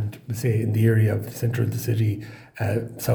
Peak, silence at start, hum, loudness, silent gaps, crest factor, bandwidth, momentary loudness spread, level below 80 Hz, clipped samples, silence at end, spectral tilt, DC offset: -8 dBFS; 0 s; none; -24 LUFS; none; 16 dB; over 20 kHz; 10 LU; -56 dBFS; under 0.1%; 0 s; -7 dB/octave; under 0.1%